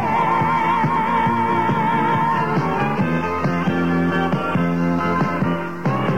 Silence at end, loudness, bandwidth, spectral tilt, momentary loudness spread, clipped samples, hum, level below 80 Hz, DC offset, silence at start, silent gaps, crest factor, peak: 0 s; -19 LUFS; 9.2 kHz; -7.5 dB/octave; 3 LU; under 0.1%; none; -48 dBFS; 1%; 0 s; none; 12 dB; -8 dBFS